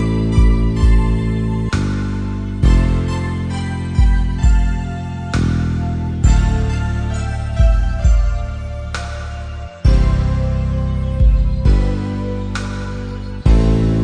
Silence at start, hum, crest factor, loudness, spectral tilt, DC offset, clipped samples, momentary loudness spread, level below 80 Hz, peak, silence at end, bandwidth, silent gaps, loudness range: 0 s; none; 14 dB; -18 LUFS; -7.5 dB/octave; under 0.1%; under 0.1%; 10 LU; -16 dBFS; 0 dBFS; 0 s; 9.6 kHz; none; 2 LU